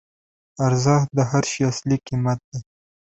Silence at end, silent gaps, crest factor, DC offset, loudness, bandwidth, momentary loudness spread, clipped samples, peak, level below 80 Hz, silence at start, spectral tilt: 0.5 s; 2.44-2.52 s; 20 dB; under 0.1%; -21 LUFS; 8.2 kHz; 9 LU; under 0.1%; -4 dBFS; -54 dBFS; 0.6 s; -6 dB/octave